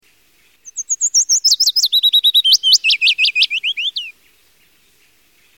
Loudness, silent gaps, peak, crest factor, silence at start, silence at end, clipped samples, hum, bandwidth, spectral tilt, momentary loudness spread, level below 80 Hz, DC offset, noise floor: -11 LUFS; none; 0 dBFS; 16 dB; 0.65 s; 1.45 s; under 0.1%; none; 17 kHz; 7.5 dB/octave; 14 LU; -70 dBFS; 0.1%; -55 dBFS